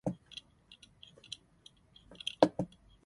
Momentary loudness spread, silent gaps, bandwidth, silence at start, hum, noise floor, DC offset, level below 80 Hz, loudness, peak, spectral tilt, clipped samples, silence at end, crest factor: 27 LU; none; 11.5 kHz; 0.05 s; none; -63 dBFS; under 0.1%; -66 dBFS; -35 LUFS; -6 dBFS; -5.5 dB/octave; under 0.1%; 0.4 s; 32 dB